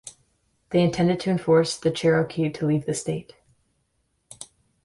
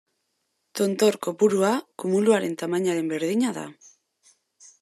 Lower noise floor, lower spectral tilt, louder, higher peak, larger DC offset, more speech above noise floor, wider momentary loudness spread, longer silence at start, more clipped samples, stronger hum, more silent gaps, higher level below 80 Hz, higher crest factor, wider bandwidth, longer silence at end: about the same, -72 dBFS vs -75 dBFS; about the same, -6 dB/octave vs -5 dB/octave; about the same, -23 LUFS vs -23 LUFS; about the same, -8 dBFS vs -8 dBFS; neither; about the same, 49 dB vs 52 dB; first, 22 LU vs 7 LU; second, 0.05 s vs 0.75 s; neither; neither; neither; first, -58 dBFS vs -78 dBFS; about the same, 16 dB vs 18 dB; second, 11.5 kHz vs 13.5 kHz; second, 0.4 s vs 1.1 s